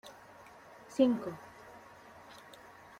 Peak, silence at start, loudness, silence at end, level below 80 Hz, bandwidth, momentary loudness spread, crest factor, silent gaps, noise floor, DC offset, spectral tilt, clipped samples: -16 dBFS; 0.05 s; -32 LUFS; 0.65 s; -74 dBFS; 15.5 kHz; 25 LU; 22 dB; none; -55 dBFS; under 0.1%; -6 dB/octave; under 0.1%